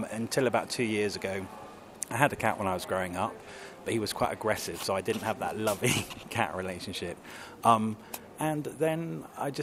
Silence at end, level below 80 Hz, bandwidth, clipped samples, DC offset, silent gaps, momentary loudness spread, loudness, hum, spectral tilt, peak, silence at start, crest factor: 0 s; -62 dBFS; 16 kHz; under 0.1%; under 0.1%; none; 13 LU; -31 LUFS; none; -4.5 dB/octave; -4 dBFS; 0 s; 26 dB